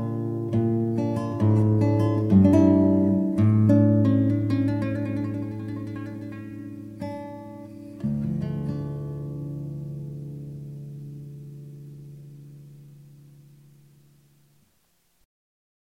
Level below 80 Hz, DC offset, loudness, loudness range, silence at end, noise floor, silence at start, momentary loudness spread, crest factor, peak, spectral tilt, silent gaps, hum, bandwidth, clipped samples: -54 dBFS; under 0.1%; -23 LUFS; 21 LU; 2.9 s; -67 dBFS; 0 s; 23 LU; 18 dB; -6 dBFS; -10 dB/octave; none; none; 6.6 kHz; under 0.1%